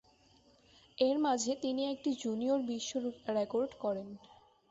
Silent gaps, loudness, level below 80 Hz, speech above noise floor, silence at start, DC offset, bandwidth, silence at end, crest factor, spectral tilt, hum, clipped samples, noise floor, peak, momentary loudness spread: none; -35 LUFS; -74 dBFS; 32 dB; 1 s; under 0.1%; 8 kHz; 0.35 s; 18 dB; -4 dB/octave; none; under 0.1%; -66 dBFS; -18 dBFS; 9 LU